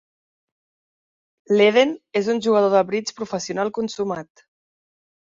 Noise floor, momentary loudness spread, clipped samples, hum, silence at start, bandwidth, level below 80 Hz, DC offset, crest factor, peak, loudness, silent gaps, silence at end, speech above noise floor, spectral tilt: under -90 dBFS; 12 LU; under 0.1%; none; 1.5 s; 7.8 kHz; -68 dBFS; under 0.1%; 18 dB; -4 dBFS; -20 LUFS; none; 1.05 s; over 70 dB; -4.5 dB/octave